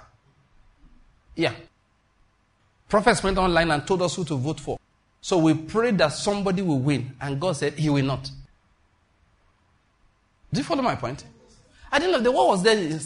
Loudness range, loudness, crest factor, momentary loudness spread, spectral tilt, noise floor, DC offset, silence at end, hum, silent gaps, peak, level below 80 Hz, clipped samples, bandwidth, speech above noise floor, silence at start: 8 LU; -23 LUFS; 20 dB; 12 LU; -5.5 dB/octave; -65 dBFS; under 0.1%; 0 s; none; none; -6 dBFS; -46 dBFS; under 0.1%; 11 kHz; 43 dB; 1.35 s